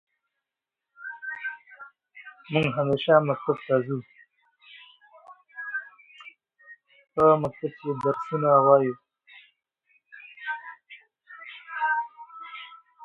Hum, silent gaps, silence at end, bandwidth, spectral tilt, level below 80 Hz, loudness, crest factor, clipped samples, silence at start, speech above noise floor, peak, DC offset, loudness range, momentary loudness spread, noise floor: none; none; 0 s; 6.6 kHz; -8 dB/octave; -66 dBFS; -25 LUFS; 24 dB; under 0.1%; 1 s; 65 dB; -4 dBFS; under 0.1%; 10 LU; 26 LU; -88 dBFS